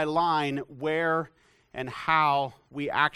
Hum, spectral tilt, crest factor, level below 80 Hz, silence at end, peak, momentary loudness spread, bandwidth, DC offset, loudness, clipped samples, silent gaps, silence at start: none; -6 dB/octave; 20 dB; -64 dBFS; 0.05 s; -8 dBFS; 14 LU; 14 kHz; under 0.1%; -27 LUFS; under 0.1%; none; 0 s